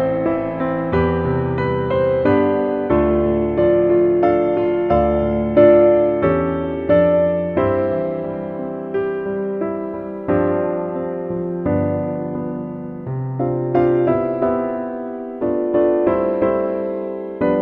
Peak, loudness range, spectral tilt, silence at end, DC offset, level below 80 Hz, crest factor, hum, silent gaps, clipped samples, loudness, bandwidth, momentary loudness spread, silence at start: 0 dBFS; 7 LU; -11 dB/octave; 0 s; under 0.1%; -40 dBFS; 18 dB; none; none; under 0.1%; -18 LUFS; 4.3 kHz; 11 LU; 0 s